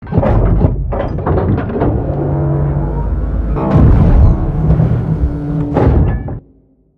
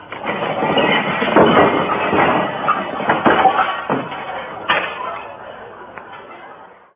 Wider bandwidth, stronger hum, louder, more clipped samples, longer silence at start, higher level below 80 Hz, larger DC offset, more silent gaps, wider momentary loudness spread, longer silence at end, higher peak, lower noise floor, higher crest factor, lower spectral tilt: first, 4.5 kHz vs 3.9 kHz; neither; about the same, -14 LUFS vs -16 LUFS; first, 0.1% vs under 0.1%; about the same, 0 s vs 0 s; first, -16 dBFS vs -50 dBFS; neither; neither; second, 8 LU vs 22 LU; first, 0.6 s vs 0.3 s; about the same, 0 dBFS vs 0 dBFS; first, -49 dBFS vs -40 dBFS; second, 12 dB vs 18 dB; first, -11.5 dB/octave vs -8.5 dB/octave